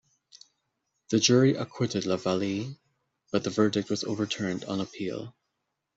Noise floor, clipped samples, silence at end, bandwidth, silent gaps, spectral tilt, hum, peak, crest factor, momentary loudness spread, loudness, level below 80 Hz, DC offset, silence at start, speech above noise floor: -82 dBFS; under 0.1%; 0.65 s; 8 kHz; none; -5 dB/octave; none; -8 dBFS; 20 dB; 13 LU; -28 LUFS; -68 dBFS; under 0.1%; 0.35 s; 55 dB